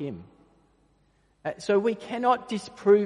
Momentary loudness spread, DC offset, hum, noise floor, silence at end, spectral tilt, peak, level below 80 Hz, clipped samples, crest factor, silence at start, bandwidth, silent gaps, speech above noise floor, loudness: 13 LU; under 0.1%; none; -66 dBFS; 0 s; -6 dB/octave; -8 dBFS; -68 dBFS; under 0.1%; 18 dB; 0 s; 10.5 kHz; none; 41 dB; -27 LUFS